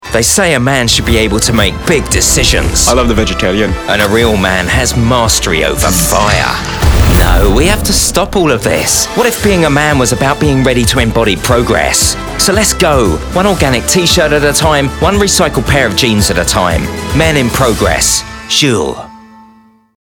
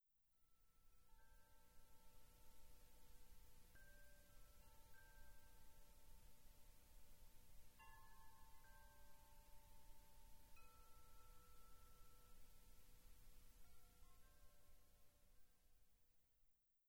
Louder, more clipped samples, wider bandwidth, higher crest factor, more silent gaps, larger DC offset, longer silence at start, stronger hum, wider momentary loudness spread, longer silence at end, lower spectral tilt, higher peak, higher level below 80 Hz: first, -9 LUFS vs -69 LUFS; first, 0.4% vs under 0.1%; about the same, over 20 kHz vs over 20 kHz; about the same, 10 dB vs 14 dB; neither; neither; about the same, 0 s vs 0 s; second, none vs 60 Hz at -85 dBFS; about the same, 3 LU vs 2 LU; first, 0.9 s vs 0 s; about the same, -3.5 dB/octave vs -3 dB/octave; first, 0 dBFS vs -50 dBFS; first, -20 dBFS vs -70 dBFS